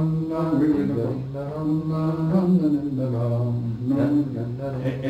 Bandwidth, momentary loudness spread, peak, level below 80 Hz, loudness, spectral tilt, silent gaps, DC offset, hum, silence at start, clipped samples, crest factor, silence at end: 8.6 kHz; 8 LU; -10 dBFS; -50 dBFS; -23 LUFS; -10 dB/octave; none; under 0.1%; none; 0 s; under 0.1%; 12 dB; 0 s